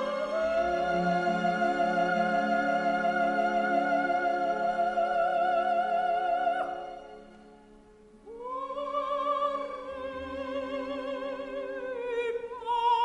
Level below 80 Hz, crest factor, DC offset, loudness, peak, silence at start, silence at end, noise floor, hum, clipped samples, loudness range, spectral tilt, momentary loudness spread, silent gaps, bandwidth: -60 dBFS; 14 dB; under 0.1%; -29 LUFS; -16 dBFS; 0 s; 0 s; -55 dBFS; none; under 0.1%; 7 LU; -5.5 dB/octave; 10 LU; none; 10 kHz